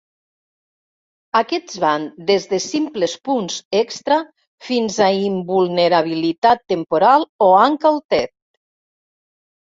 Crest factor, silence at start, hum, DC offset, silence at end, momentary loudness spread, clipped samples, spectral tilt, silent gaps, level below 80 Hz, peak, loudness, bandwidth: 18 dB; 1.35 s; none; under 0.1%; 1.45 s; 8 LU; under 0.1%; -4.5 dB/octave; 3.65-3.71 s, 4.47-4.58 s, 6.38-6.42 s, 7.29-7.39 s, 8.05-8.09 s; -62 dBFS; 0 dBFS; -17 LUFS; 7.8 kHz